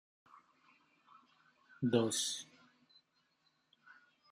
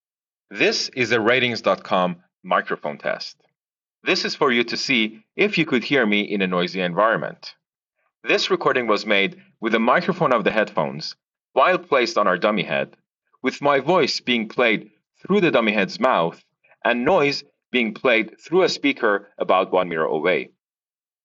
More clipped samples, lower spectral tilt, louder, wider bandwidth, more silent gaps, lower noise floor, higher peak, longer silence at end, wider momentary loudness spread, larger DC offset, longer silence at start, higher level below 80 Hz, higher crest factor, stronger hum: neither; first, -4 dB/octave vs -2.5 dB/octave; second, -36 LUFS vs -20 LUFS; first, 14 kHz vs 7.6 kHz; neither; second, -78 dBFS vs under -90 dBFS; second, -18 dBFS vs -2 dBFS; first, 1.85 s vs 0.8 s; first, 13 LU vs 9 LU; neither; first, 1.8 s vs 0.5 s; second, -86 dBFS vs -68 dBFS; first, 24 dB vs 18 dB; neither